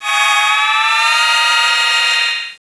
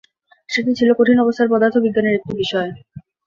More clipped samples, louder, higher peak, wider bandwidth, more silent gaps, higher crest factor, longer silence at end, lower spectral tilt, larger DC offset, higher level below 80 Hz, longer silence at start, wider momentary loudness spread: neither; first, -11 LUFS vs -17 LUFS; about the same, -2 dBFS vs -2 dBFS; first, 11 kHz vs 7.4 kHz; neither; about the same, 12 dB vs 14 dB; second, 0.1 s vs 0.25 s; second, 4 dB/octave vs -6 dB/octave; neither; second, -66 dBFS vs -56 dBFS; second, 0 s vs 0.5 s; second, 2 LU vs 9 LU